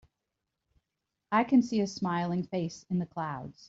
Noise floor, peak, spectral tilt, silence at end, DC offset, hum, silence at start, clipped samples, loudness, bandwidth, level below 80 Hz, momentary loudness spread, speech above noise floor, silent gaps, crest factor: -86 dBFS; -14 dBFS; -6.5 dB/octave; 0.05 s; under 0.1%; none; 1.3 s; under 0.1%; -30 LUFS; 7.8 kHz; -70 dBFS; 10 LU; 56 dB; none; 18 dB